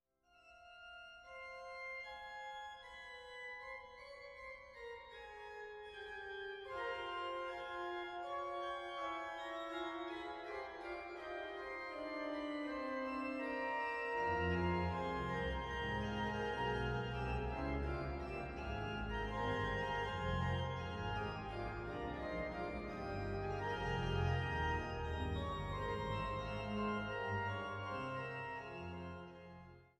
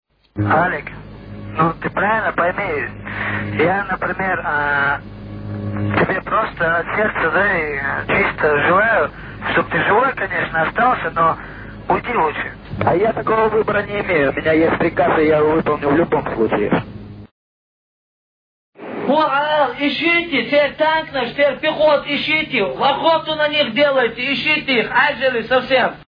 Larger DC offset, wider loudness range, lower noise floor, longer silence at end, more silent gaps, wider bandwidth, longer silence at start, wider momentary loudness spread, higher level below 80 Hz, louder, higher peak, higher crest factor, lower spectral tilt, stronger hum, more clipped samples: neither; first, 10 LU vs 4 LU; second, -69 dBFS vs under -90 dBFS; about the same, 0.15 s vs 0.05 s; second, none vs 17.31-18.73 s; first, 11 kHz vs 5.2 kHz; about the same, 0.35 s vs 0.35 s; first, 13 LU vs 10 LU; second, -54 dBFS vs -44 dBFS; second, -43 LUFS vs -17 LUFS; second, -26 dBFS vs -2 dBFS; about the same, 18 dB vs 14 dB; second, -6.5 dB/octave vs -8 dB/octave; neither; neither